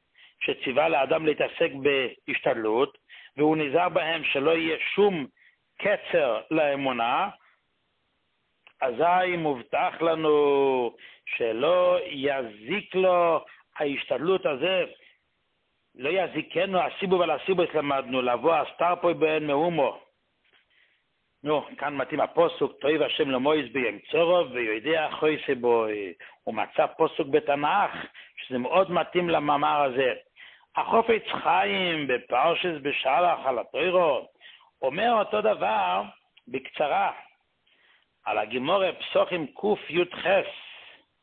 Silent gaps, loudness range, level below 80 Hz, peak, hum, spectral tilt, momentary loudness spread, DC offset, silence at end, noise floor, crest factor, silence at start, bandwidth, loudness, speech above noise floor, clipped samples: none; 3 LU; -68 dBFS; -8 dBFS; none; -9 dB/octave; 9 LU; under 0.1%; 0.35 s; -74 dBFS; 18 dB; 0.4 s; 4.4 kHz; -25 LUFS; 49 dB; under 0.1%